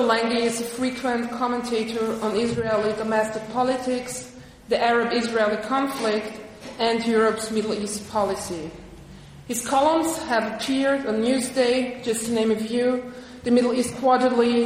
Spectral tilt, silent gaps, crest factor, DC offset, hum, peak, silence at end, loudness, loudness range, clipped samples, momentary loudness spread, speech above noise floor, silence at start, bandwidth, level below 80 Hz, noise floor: -4 dB/octave; none; 18 dB; under 0.1%; none; -6 dBFS; 0 s; -23 LUFS; 3 LU; under 0.1%; 10 LU; 20 dB; 0 s; 15.5 kHz; -54 dBFS; -43 dBFS